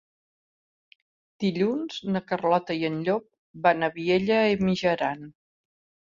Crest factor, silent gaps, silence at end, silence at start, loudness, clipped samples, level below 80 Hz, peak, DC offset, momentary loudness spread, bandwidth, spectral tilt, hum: 20 dB; 3.39-3.54 s; 0.85 s; 1.4 s; -25 LUFS; under 0.1%; -62 dBFS; -6 dBFS; under 0.1%; 8 LU; 7.4 kHz; -6.5 dB/octave; none